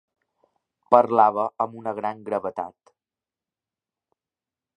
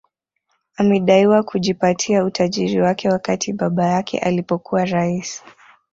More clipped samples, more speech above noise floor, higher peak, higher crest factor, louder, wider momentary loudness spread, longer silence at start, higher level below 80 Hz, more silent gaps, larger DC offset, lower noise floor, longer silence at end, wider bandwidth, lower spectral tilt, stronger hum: neither; first, over 68 dB vs 53 dB; about the same, 0 dBFS vs -2 dBFS; first, 26 dB vs 16 dB; second, -22 LUFS vs -18 LUFS; first, 14 LU vs 8 LU; about the same, 0.9 s vs 0.8 s; second, -72 dBFS vs -56 dBFS; neither; neither; first, under -90 dBFS vs -70 dBFS; first, 2.1 s vs 0.55 s; first, 9.8 kHz vs 7.8 kHz; first, -8 dB/octave vs -5.5 dB/octave; neither